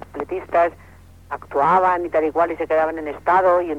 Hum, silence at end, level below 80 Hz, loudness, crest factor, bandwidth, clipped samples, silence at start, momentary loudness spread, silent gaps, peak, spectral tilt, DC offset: none; 0 s; -50 dBFS; -19 LUFS; 14 dB; 11 kHz; under 0.1%; 0 s; 12 LU; none; -6 dBFS; -7 dB/octave; 0.1%